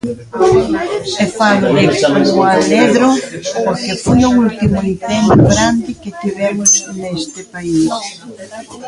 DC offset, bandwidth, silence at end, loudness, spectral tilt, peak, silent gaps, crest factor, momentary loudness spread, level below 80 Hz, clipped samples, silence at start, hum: under 0.1%; 11.5 kHz; 0 s; -13 LUFS; -4.5 dB/octave; 0 dBFS; none; 12 dB; 13 LU; -36 dBFS; under 0.1%; 0.05 s; none